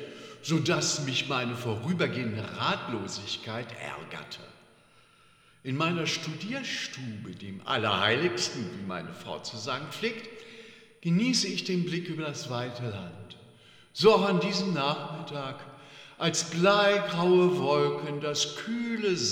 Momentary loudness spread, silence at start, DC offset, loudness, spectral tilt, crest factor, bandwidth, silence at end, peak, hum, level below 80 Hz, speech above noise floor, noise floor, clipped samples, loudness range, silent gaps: 17 LU; 0 s; under 0.1%; -29 LUFS; -4 dB/octave; 22 dB; 16 kHz; 0 s; -8 dBFS; none; -72 dBFS; 31 dB; -60 dBFS; under 0.1%; 8 LU; none